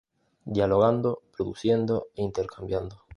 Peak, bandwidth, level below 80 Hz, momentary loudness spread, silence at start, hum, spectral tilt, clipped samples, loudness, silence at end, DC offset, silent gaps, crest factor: -8 dBFS; 10.5 kHz; -52 dBFS; 11 LU; 0.45 s; none; -8 dB/octave; under 0.1%; -27 LUFS; 0 s; under 0.1%; none; 18 dB